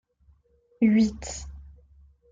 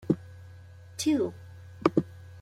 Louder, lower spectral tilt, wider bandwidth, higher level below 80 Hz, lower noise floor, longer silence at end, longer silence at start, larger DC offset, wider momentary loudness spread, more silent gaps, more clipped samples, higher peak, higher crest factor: first, -24 LUFS vs -29 LUFS; about the same, -5.5 dB/octave vs -6 dB/octave; second, 7.8 kHz vs 15.5 kHz; first, -48 dBFS vs -64 dBFS; first, -63 dBFS vs -49 dBFS; first, 0.7 s vs 0 s; first, 0.8 s vs 0.05 s; neither; second, 18 LU vs 22 LU; neither; neither; second, -10 dBFS vs -6 dBFS; second, 18 dB vs 26 dB